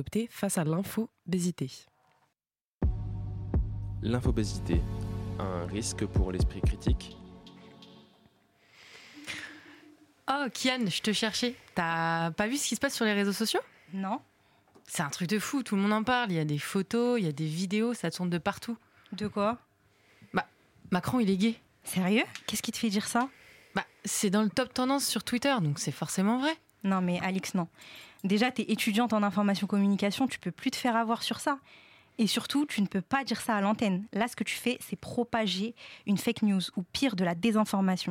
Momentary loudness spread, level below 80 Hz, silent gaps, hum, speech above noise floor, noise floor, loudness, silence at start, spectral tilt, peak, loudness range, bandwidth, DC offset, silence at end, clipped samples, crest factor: 10 LU; -44 dBFS; 2.64-2.79 s; none; 60 dB; -89 dBFS; -30 LUFS; 0 s; -5 dB/octave; -14 dBFS; 5 LU; 16.5 kHz; under 0.1%; 0 s; under 0.1%; 16 dB